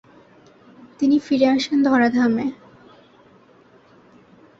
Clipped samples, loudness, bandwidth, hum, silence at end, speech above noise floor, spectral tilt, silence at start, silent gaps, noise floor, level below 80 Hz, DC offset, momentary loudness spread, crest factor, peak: under 0.1%; -19 LUFS; 7.6 kHz; none; 2.05 s; 34 dB; -5 dB/octave; 1 s; none; -52 dBFS; -64 dBFS; under 0.1%; 7 LU; 18 dB; -4 dBFS